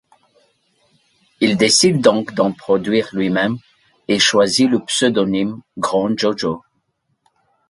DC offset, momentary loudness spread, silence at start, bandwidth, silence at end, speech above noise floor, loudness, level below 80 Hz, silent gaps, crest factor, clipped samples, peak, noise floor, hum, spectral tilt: under 0.1%; 11 LU; 1.4 s; 11.5 kHz; 1.1 s; 52 dB; -16 LUFS; -56 dBFS; none; 18 dB; under 0.1%; 0 dBFS; -68 dBFS; none; -3.5 dB/octave